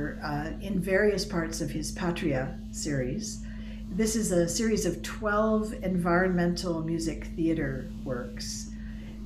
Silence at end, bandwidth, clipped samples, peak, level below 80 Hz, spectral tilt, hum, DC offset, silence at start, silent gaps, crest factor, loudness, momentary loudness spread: 0 s; 15.5 kHz; under 0.1%; -12 dBFS; -42 dBFS; -5 dB/octave; none; under 0.1%; 0 s; none; 16 dB; -29 LUFS; 11 LU